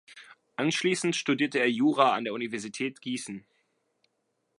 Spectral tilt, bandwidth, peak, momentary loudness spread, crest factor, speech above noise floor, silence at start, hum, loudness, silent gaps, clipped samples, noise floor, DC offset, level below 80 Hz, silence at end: -4 dB/octave; 11.5 kHz; -6 dBFS; 12 LU; 22 dB; 50 dB; 0.1 s; none; -28 LUFS; none; under 0.1%; -77 dBFS; under 0.1%; -80 dBFS; 1.2 s